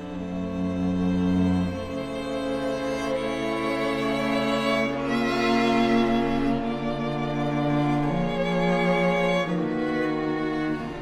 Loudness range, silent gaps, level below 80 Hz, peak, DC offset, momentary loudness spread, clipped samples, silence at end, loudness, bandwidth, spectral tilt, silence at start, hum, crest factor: 3 LU; none; -44 dBFS; -10 dBFS; under 0.1%; 7 LU; under 0.1%; 0 s; -25 LUFS; 13.5 kHz; -6.5 dB/octave; 0 s; none; 14 dB